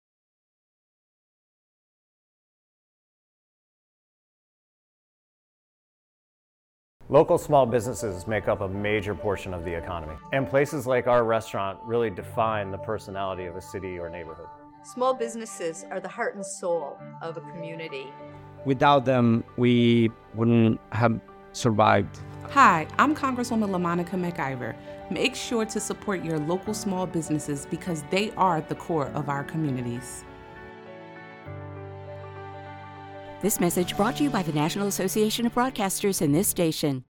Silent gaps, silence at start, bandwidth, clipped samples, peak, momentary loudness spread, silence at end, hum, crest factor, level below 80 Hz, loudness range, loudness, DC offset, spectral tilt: none; 7 s; 18 kHz; under 0.1%; -4 dBFS; 19 LU; 0.1 s; none; 22 dB; -56 dBFS; 9 LU; -25 LUFS; under 0.1%; -5 dB/octave